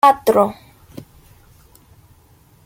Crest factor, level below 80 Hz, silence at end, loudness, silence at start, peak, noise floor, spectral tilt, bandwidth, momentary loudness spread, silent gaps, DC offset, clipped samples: 20 dB; -54 dBFS; 2.15 s; -16 LUFS; 0.05 s; 0 dBFS; -51 dBFS; -5 dB/octave; 17 kHz; 27 LU; none; under 0.1%; under 0.1%